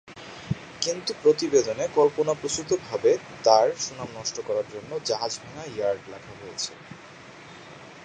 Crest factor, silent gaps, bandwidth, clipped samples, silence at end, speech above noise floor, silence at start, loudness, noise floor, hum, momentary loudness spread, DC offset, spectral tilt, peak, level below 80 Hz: 24 dB; none; 9.8 kHz; under 0.1%; 0 s; 20 dB; 0.05 s; -26 LUFS; -46 dBFS; none; 23 LU; under 0.1%; -3.5 dB/octave; -2 dBFS; -60 dBFS